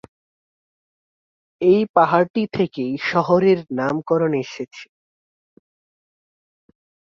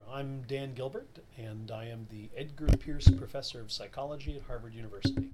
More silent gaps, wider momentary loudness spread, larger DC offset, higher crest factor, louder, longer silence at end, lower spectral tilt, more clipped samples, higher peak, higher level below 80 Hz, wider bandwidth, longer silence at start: first, 1.89-1.94 s, 2.30-2.34 s vs none; second, 13 LU vs 19 LU; neither; second, 20 dB vs 28 dB; first, -19 LUFS vs -34 LUFS; first, 2.3 s vs 0 s; about the same, -7.5 dB/octave vs -7 dB/octave; neither; about the same, -2 dBFS vs -4 dBFS; second, -62 dBFS vs -36 dBFS; second, 7 kHz vs 12.5 kHz; first, 1.6 s vs 0 s